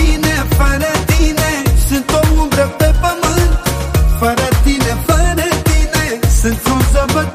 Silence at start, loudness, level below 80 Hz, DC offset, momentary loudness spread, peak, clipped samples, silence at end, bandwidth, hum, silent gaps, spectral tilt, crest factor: 0 s; -13 LUFS; -14 dBFS; under 0.1%; 2 LU; 0 dBFS; under 0.1%; 0 s; 15.5 kHz; none; none; -5 dB/octave; 12 dB